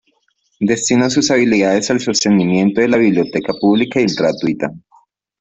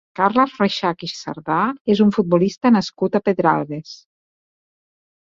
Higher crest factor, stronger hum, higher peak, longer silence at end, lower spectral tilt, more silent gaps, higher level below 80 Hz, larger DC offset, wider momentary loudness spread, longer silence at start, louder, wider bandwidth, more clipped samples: second, 12 dB vs 18 dB; neither; about the same, -2 dBFS vs 0 dBFS; second, 0.65 s vs 1.45 s; second, -4.5 dB/octave vs -6.5 dB/octave; second, none vs 1.81-1.85 s; first, -54 dBFS vs -60 dBFS; neither; second, 6 LU vs 12 LU; first, 0.6 s vs 0.2 s; first, -15 LUFS vs -18 LUFS; about the same, 8.2 kHz vs 7.6 kHz; neither